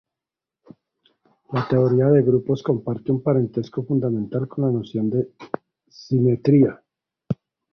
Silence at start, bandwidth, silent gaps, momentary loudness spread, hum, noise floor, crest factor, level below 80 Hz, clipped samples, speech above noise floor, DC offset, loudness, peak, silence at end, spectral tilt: 1.5 s; 6.2 kHz; none; 14 LU; none; -88 dBFS; 18 dB; -58 dBFS; under 0.1%; 68 dB; under 0.1%; -21 LUFS; -4 dBFS; 0.4 s; -10 dB/octave